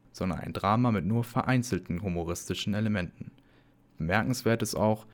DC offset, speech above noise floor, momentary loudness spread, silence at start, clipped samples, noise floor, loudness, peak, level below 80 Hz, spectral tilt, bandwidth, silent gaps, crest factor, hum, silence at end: under 0.1%; 32 dB; 8 LU; 0.15 s; under 0.1%; -61 dBFS; -29 LUFS; -10 dBFS; -52 dBFS; -6 dB/octave; 19.5 kHz; none; 20 dB; none; 0 s